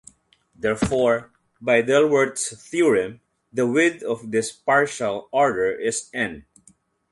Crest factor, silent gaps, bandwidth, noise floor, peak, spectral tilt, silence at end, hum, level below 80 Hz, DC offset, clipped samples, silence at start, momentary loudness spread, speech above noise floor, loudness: 18 dB; none; 11.5 kHz; -58 dBFS; -4 dBFS; -4 dB/octave; 0.7 s; none; -52 dBFS; under 0.1%; under 0.1%; 0.6 s; 10 LU; 37 dB; -22 LUFS